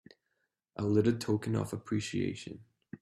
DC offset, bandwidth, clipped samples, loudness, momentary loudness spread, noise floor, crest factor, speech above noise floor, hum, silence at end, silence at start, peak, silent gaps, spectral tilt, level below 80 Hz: under 0.1%; 13 kHz; under 0.1%; -33 LUFS; 20 LU; -82 dBFS; 20 dB; 50 dB; none; 0.05 s; 0.8 s; -14 dBFS; none; -6.5 dB/octave; -66 dBFS